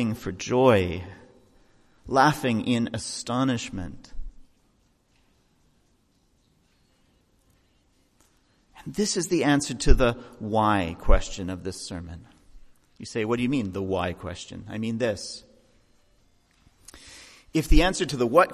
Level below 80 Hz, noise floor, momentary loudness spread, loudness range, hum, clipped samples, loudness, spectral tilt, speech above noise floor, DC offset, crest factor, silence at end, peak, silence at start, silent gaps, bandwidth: -34 dBFS; -66 dBFS; 22 LU; 9 LU; none; under 0.1%; -26 LUFS; -5 dB/octave; 42 dB; under 0.1%; 24 dB; 0 s; -2 dBFS; 0 s; none; 14 kHz